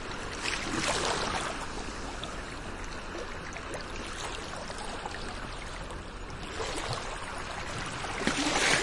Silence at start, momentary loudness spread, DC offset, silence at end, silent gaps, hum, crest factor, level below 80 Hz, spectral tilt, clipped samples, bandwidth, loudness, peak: 0 s; 11 LU; under 0.1%; 0 s; none; none; 26 dB; -44 dBFS; -2.5 dB/octave; under 0.1%; 11.5 kHz; -34 LUFS; -8 dBFS